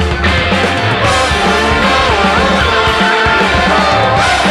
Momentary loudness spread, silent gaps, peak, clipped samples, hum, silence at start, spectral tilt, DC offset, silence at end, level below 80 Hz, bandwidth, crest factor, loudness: 2 LU; none; 0 dBFS; under 0.1%; none; 0 s; -4.5 dB/octave; under 0.1%; 0 s; -24 dBFS; 14 kHz; 10 dB; -10 LUFS